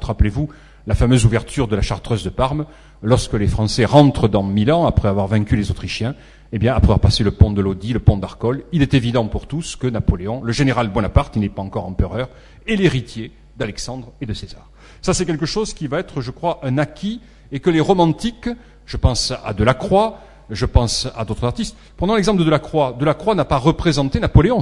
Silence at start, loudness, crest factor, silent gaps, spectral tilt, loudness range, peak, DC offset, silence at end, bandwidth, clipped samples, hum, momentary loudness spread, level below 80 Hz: 0 s; -18 LUFS; 18 dB; none; -6 dB/octave; 6 LU; 0 dBFS; under 0.1%; 0 s; 11.5 kHz; under 0.1%; none; 13 LU; -28 dBFS